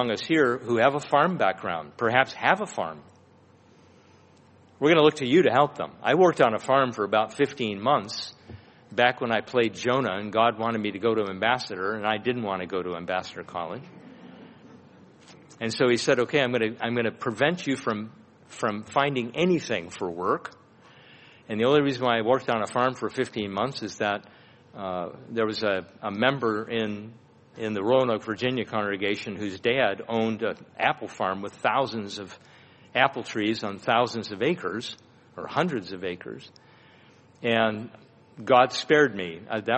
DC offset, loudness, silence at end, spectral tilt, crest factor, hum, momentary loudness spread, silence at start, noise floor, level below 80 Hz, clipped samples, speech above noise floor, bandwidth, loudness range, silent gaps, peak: under 0.1%; -25 LUFS; 0 s; -5 dB/octave; 22 dB; none; 13 LU; 0 s; -56 dBFS; -68 dBFS; under 0.1%; 31 dB; 8.4 kHz; 6 LU; none; -4 dBFS